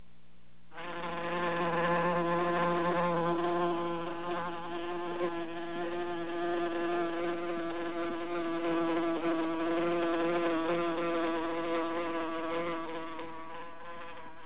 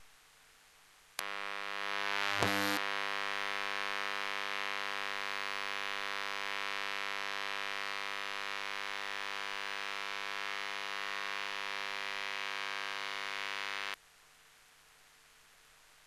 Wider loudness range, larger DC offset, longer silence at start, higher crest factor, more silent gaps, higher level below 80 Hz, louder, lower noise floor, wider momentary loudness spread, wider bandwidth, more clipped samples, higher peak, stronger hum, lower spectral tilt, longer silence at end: about the same, 4 LU vs 4 LU; first, 0.7% vs under 0.1%; first, 0.7 s vs 0 s; second, 14 dB vs 32 dB; neither; first, -64 dBFS vs -74 dBFS; first, -33 LUFS vs -37 LUFS; about the same, -63 dBFS vs -63 dBFS; first, 11 LU vs 5 LU; second, 4 kHz vs 13 kHz; neither; second, -18 dBFS vs -8 dBFS; first, 60 Hz at -65 dBFS vs none; first, -4.5 dB/octave vs -1.5 dB/octave; about the same, 0 s vs 0 s